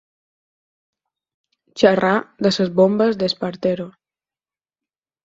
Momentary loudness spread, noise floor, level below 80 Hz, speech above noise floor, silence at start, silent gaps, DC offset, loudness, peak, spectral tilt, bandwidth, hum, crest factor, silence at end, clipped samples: 10 LU; under -90 dBFS; -62 dBFS; over 72 dB; 1.75 s; none; under 0.1%; -18 LUFS; 0 dBFS; -6 dB/octave; 7.8 kHz; none; 22 dB; 1.35 s; under 0.1%